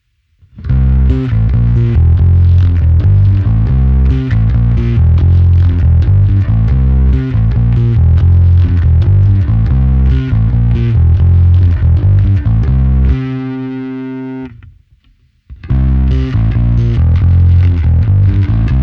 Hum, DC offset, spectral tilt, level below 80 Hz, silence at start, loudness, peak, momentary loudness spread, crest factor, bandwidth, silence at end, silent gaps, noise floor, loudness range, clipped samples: none; under 0.1%; -10.5 dB/octave; -14 dBFS; 0.55 s; -11 LUFS; 0 dBFS; 6 LU; 8 dB; 4.2 kHz; 0 s; none; -50 dBFS; 6 LU; under 0.1%